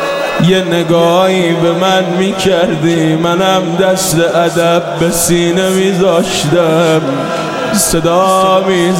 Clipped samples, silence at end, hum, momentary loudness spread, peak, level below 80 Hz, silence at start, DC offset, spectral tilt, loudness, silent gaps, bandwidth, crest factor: under 0.1%; 0 s; none; 3 LU; 0 dBFS; -40 dBFS; 0 s; 0.1%; -4.5 dB/octave; -11 LUFS; none; 16.5 kHz; 10 dB